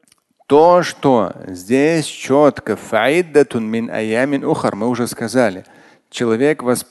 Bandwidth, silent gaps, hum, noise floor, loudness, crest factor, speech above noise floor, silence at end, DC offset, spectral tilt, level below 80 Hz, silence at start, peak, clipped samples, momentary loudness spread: 12.5 kHz; none; none; -45 dBFS; -16 LUFS; 16 dB; 29 dB; 0.1 s; under 0.1%; -5.5 dB/octave; -56 dBFS; 0.5 s; 0 dBFS; under 0.1%; 9 LU